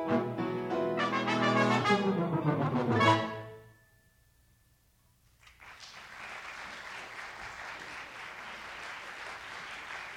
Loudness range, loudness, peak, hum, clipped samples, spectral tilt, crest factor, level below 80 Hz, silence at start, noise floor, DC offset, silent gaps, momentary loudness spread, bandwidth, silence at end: 18 LU; -32 LUFS; -14 dBFS; none; under 0.1%; -6 dB/octave; 20 dB; -68 dBFS; 0 s; -67 dBFS; under 0.1%; none; 17 LU; 16 kHz; 0 s